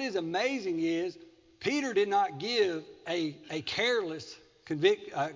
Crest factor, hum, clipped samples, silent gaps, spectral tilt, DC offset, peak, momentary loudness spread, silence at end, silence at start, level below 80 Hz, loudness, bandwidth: 20 dB; none; under 0.1%; none; -4.5 dB/octave; under 0.1%; -12 dBFS; 11 LU; 0 s; 0 s; -72 dBFS; -31 LUFS; 7.6 kHz